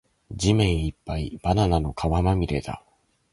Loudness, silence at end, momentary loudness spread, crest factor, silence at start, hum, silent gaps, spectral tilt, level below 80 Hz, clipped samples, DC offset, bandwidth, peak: -24 LUFS; 0.55 s; 12 LU; 18 dB; 0.3 s; none; none; -6.5 dB/octave; -34 dBFS; under 0.1%; under 0.1%; 11.5 kHz; -8 dBFS